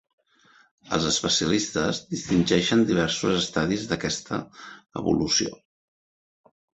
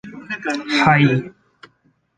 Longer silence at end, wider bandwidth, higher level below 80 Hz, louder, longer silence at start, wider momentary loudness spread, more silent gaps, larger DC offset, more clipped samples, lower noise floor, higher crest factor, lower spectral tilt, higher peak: first, 1.2 s vs 0.9 s; second, 8.2 kHz vs 9.4 kHz; about the same, -52 dBFS vs -56 dBFS; second, -24 LUFS vs -17 LUFS; first, 0.85 s vs 0.05 s; second, 12 LU vs 16 LU; neither; neither; neither; about the same, -59 dBFS vs -61 dBFS; about the same, 22 dB vs 18 dB; second, -4 dB/octave vs -6 dB/octave; about the same, -4 dBFS vs -2 dBFS